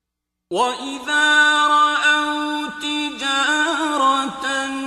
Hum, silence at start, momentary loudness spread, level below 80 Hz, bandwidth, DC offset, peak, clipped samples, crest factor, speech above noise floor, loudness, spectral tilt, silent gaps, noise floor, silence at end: none; 0.5 s; 10 LU; -62 dBFS; 14.5 kHz; under 0.1%; -4 dBFS; under 0.1%; 14 dB; 63 dB; -18 LUFS; -0.5 dB/octave; none; -80 dBFS; 0 s